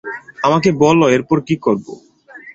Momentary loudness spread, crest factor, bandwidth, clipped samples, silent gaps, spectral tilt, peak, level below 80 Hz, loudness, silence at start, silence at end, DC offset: 12 LU; 14 dB; 7.8 kHz; under 0.1%; none; -6 dB/octave; -2 dBFS; -52 dBFS; -15 LUFS; 0.05 s; 0.05 s; under 0.1%